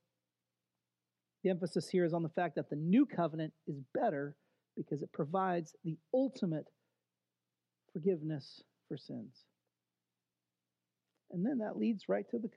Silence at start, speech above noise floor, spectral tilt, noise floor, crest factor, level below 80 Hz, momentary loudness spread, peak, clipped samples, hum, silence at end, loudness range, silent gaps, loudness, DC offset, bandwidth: 1.45 s; over 54 dB; -8 dB/octave; under -90 dBFS; 18 dB; under -90 dBFS; 14 LU; -20 dBFS; under 0.1%; none; 0.05 s; 8 LU; none; -37 LUFS; under 0.1%; 11 kHz